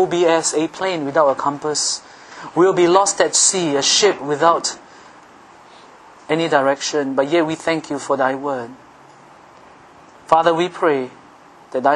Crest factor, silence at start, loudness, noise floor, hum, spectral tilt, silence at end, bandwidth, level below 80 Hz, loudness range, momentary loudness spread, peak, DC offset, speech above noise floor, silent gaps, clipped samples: 18 dB; 0 s; -17 LUFS; -45 dBFS; none; -2.5 dB/octave; 0 s; 11 kHz; -64 dBFS; 6 LU; 12 LU; 0 dBFS; under 0.1%; 28 dB; none; under 0.1%